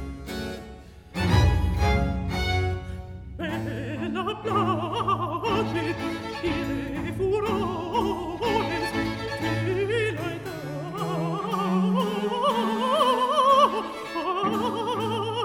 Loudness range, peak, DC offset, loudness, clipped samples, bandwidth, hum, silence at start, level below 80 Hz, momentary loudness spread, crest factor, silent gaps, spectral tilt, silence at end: 5 LU; -8 dBFS; under 0.1%; -26 LUFS; under 0.1%; 17 kHz; none; 0 s; -36 dBFS; 12 LU; 18 dB; none; -6 dB/octave; 0 s